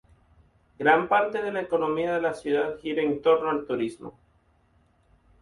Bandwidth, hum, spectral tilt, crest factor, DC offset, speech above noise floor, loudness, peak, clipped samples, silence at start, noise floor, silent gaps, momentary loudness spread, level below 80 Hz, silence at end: 11.5 kHz; none; -6 dB/octave; 20 dB; under 0.1%; 39 dB; -25 LUFS; -8 dBFS; under 0.1%; 0.8 s; -64 dBFS; none; 8 LU; -62 dBFS; 1.3 s